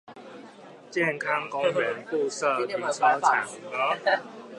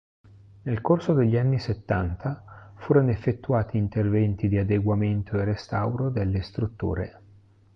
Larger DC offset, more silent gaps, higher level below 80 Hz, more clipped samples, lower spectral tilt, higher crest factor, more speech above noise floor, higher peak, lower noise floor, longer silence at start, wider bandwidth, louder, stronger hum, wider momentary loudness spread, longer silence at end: neither; neither; second, -82 dBFS vs -42 dBFS; neither; second, -3.5 dB/octave vs -9.5 dB/octave; about the same, 20 dB vs 18 dB; second, 21 dB vs 31 dB; about the same, -6 dBFS vs -8 dBFS; second, -47 dBFS vs -55 dBFS; second, 0.1 s vs 0.65 s; first, 11.5 kHz vs 6.2 kHz; about the same, -26 LUFS vs -25 LUFS; neither; about the same, 12 LU vs 10 LU; second, 0 s vs 0.65 s